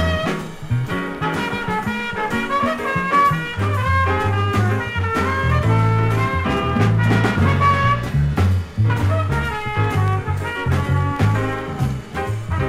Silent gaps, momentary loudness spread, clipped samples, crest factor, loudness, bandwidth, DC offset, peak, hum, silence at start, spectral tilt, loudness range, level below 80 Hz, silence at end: none; 7 LU; under 0.1%; 14 dB; -19 LUFS; 14.5 kHz; under 0.1%; -4 dBFS; none; 0 s; -7 dB/octave; 3 LU; -34 dBFS; 0 s